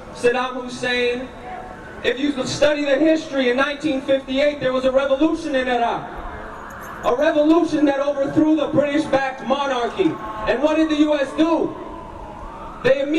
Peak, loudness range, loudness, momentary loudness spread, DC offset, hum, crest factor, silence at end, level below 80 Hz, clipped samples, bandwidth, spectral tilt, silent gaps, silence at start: -4 dBFS; 2 LU; -19 LUFS; 16 LU; under 0.1%; none; 16 dB; 0 s; -44 dBFS; under 0.1%; 10.5 kHz; -5 dB/octave; none; 0 s